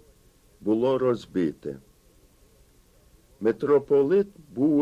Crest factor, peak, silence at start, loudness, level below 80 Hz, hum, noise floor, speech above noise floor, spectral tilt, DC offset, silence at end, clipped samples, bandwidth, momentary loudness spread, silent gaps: 16 dB; -10 dBFS; 0.6 s; -25 LUFS; -60 dBFS; none; -58 dBFS; 35 dB; -8 dB/octave; under 0.1%; 0 s; under 0.1%; 9.8 kHz; 14 LU; none